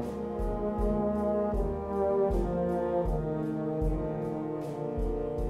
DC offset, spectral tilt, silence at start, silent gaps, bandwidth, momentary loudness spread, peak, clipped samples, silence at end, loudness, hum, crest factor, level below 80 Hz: under 0.1%; -9.5 dB/octave; 0 s; none; 12 kHz; 6 LU; -18 dBFS; under 0.1%; 0 s; -31 LUFS; none; 12 dB; -38 dBFS